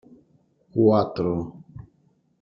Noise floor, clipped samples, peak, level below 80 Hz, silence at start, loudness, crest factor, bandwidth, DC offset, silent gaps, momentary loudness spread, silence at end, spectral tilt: -64 dBFS; under 0.1%; -6 dBFS; -56 dBFS; 0.75 s; -23 LUFS; 20 dB; 5.8 kHz; under 0.1%; none; 24 LU; 0.65 s; -10.5 dB/octave